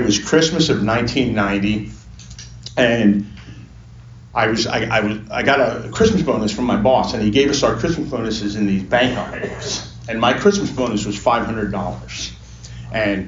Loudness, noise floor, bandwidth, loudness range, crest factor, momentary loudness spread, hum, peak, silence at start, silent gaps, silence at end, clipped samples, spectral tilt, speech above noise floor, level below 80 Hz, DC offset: -18 LUFS; -39 dBFS; 7.6 kHz; 3 LU; 16 dB; 14 LU; none; -2 dBFS; 0 s; none; 0 s; under 0.1%; -5 dB/octave; 22 dB; -40 dBFS; under 0.1%